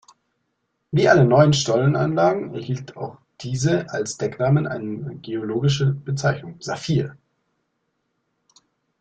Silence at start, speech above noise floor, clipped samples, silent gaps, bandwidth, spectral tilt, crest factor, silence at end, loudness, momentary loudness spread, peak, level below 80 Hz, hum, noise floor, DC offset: 0.9 s; 54 dB; under 0.1%; none; 9 kHz; -6 dB/octave; 20 dB; 1.85 s; -21 LUFS; 15 LU; -2 dBFS; -56 dBFS; none; -74 dBFS; under 0.1%